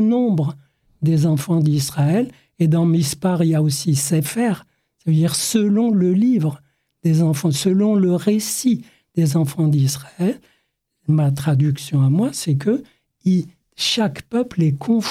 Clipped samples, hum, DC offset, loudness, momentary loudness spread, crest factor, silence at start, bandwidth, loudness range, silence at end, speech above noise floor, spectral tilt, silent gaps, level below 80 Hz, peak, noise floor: under 0.1%; none; under 0.1%; -19 LUFS; 7 LU; 12 dB; 0 s; 15.5 kHz; 2 LU; 0 s; 51 dB; -6 dB/octave; none; -60 dBFS; -6 dBFS; -69 dBFS